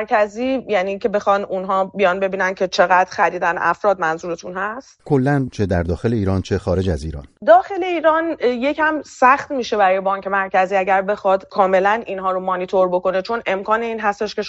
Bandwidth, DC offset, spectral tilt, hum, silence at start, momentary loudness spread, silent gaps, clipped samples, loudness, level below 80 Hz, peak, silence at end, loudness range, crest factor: 10 kHz; under 0.1%; -6 dB/octave; none; 0 s; 7 LU; none; under 0.1%; -18 LUFS; -42 dBFS; -2 dBFS; 0 s; 3 LU; 16 dB